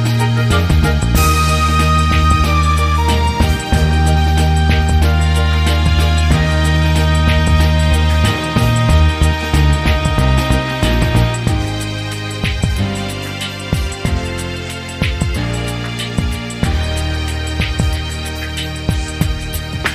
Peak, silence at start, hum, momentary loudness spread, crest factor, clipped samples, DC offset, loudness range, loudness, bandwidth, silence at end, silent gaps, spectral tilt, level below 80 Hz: 0 dBFS; 0 s; none; 9 LU; 14 dB; under 0.1%; under 0.1%; 6 LU; -15 LUFS; 15.5 kHz; 0 s; none; -5.5 dB/octave; -18 dBFS